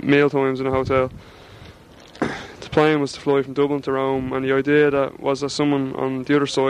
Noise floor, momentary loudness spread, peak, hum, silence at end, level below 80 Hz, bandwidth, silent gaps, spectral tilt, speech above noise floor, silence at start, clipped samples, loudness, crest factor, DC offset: -45 dBFS; 9 LU; -4 dBFS; none; 0 s; -48 dBFS; 10.5 kHz; none; -6 dB/octave; 25 dB; 0 s; under 0.1%; -20 LUFS; 18 dB; under 0.1%